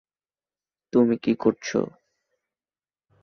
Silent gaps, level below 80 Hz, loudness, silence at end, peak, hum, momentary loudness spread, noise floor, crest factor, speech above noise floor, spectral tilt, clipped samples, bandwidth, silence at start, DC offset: none; -66 dBFS; -24 LUFS; 1.35 s; -6 dBFS; none; 7 LU; under -90 dBFS; 20 dB; over 68 dB; -6 dB/octave; under 0.1%; 6.6 kHz; 0.95 s; under 0.1%